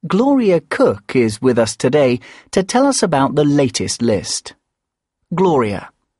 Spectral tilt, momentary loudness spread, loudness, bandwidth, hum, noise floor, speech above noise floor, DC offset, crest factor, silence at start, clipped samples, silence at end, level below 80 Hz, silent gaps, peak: -5 dB/octave; 8 LU; -16 LUFS; 11.5 kHz; none; -80 dBFS; 64 dB; under 0.1%; 16 dB; 0.05 s; under 0.1%; 0.3 s; -50 dBFS; none; 0 dBFS